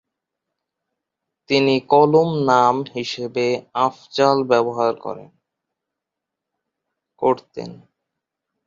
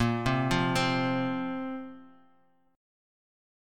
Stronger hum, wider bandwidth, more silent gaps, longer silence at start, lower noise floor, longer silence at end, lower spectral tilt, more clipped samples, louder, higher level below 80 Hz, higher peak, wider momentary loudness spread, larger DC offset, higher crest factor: neither; second, 7.6 kHz vs 16.5 kHz; neither; first, 1.5 s vs 0 s; first, -84 dBFS vs -67 dBFS; second, 0.9 s vs 1.7 s; about the same, -6 dB/octave vs -5.5 dB/octave; neither; first, -18 LUFS vs -29 LUFS; second, -66 dBFS vs -52 dBFS; first, 0 dBFS vs -14 dBFS; first, 16 LU vs 12 LU; neither; about the same, 20 dB vs 18 dB